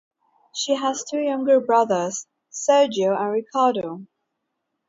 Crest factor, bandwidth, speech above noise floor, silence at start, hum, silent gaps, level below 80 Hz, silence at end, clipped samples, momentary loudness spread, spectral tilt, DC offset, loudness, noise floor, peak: 18 dB; 7.8 kHz; 57 dB; 0.55 s; none; none; -74 dBFS; 0.85 s; under 0.1%; 15 LU; -3.5 dB/octave; under 0.1%; -21 LUFS; -78 dBFS; -4 dBFS